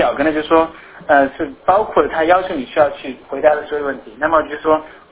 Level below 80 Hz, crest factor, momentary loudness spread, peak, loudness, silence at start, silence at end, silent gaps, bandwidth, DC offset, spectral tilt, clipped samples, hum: -46 dBFS; 16 dB; 8 LU; 0 dBFS; -16 LUFS; 0 s; 0.2 s; none; 4 kHz; under 0.1%; -8.5 dB/octave; under 0.1%; none